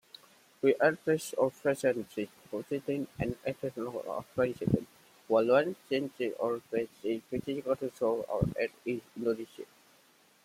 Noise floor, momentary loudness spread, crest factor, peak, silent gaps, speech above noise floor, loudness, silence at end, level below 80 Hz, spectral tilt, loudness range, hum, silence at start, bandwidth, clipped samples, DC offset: -64 dBFS; 11 LU; 20 dB; -12 dBFS; none; 32 dB; -32 LUFS; 0.8 s; -60 dBFS; -6.5 dB/octave; 3 LU; none; 0.65 s; 16.5 kHz; under 0.1%; under 0.1%